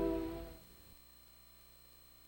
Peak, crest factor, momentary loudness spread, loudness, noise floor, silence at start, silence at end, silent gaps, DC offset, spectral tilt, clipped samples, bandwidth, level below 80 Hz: -26 dBFS; 20 dB; 18 LU; -45 LUFS; -61 dBFS; 0 s; 0 s; none; under 0.1%; -6.5 dB/octave; under 0.1%; 16.5 kHz; -56 dBFS